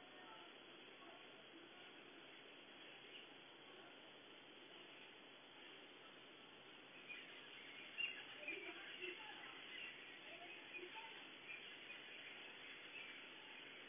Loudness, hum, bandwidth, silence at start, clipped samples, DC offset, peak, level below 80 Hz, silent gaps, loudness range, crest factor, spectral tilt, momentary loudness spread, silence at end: -55 LUFS; none; 4 kHz; 0 s; under 0.1%; under 0.1%; -36 dBFS; under -90 dBFS; none; 9 LU; 22 dB; 0.5 dB/octave; 10 LU; 0 s